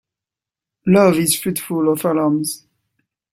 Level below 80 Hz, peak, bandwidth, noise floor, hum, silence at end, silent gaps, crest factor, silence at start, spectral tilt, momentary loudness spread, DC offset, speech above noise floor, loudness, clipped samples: -56 dBFS; -2 dBFS; 16.5 kHz; -88 dBFS; none; 0.75 s; none; 16 dB; 0.85 s; -5 dB/octave; 12 LU; under 0.1%; 72 dB; -17 LUFS; under 0.1%